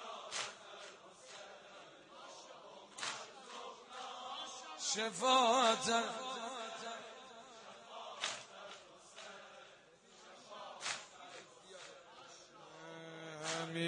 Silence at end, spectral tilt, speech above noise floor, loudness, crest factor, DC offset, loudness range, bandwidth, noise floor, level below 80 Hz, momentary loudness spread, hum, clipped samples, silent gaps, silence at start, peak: 0 s; -2 dB/octave; 29 dB; -39 LUFS; 24 dB; under 0.1%; 14 LU; 11 kHz; -63 dBFS; -90 dBFS; 23 LU; none; under 0.1%; none; 0 s; -18 dBFS